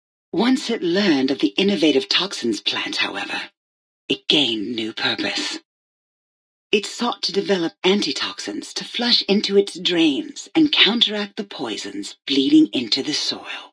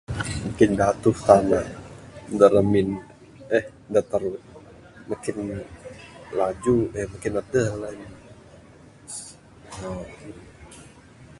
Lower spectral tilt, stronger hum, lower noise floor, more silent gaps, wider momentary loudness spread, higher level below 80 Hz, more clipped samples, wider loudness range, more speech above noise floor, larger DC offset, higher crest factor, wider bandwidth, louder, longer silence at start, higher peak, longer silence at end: second, -3.5 dB/octave vs -6.5 dB/octave; neither; first, under -90 dBFS vs -49 dBFS; first, 3.57-4.08 s, 5.65-6.70 s vs none; second, 12 LU vs 25 LU; second, -70 dBFS vs -48 dBFS; neither; second, 5 LU vs 11 LU; first, over 70 dB vs 27 dB; neither; about the same, 20 dB vs 24 dB; about the same, 11 kHz vs 11.5 kHz; first, -19 LUFS vs -23 LUFS; first, 0.35 s vs 0.1 s; about the same, -2 dBFS vs 0 dBFS; about the same, 0.05 s vs 0.15 s